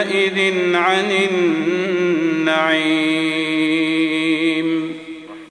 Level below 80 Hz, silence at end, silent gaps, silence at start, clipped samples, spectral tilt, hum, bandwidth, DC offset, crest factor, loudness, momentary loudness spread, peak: -66 dBFS; 0.05 s; none; 0 s; under 0.1%; -4.5 dB/octave; none; 10.5 kHz; under 0.1%; 14 dB; -17 LUFS; 5 LU; -2 dBFS